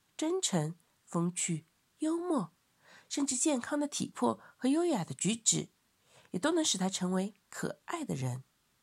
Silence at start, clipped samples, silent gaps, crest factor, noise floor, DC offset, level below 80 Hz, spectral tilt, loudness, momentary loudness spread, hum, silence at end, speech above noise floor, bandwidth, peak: 0.2 s; under 0.1%; none; 22 dB; -66 dBFS; under 0.1%; -80 dBFS; -4 dB/octave; -33 LUFS; 11 LU; none; 0.4 s; 33 dB; 15.5 kHz; -14 dBFS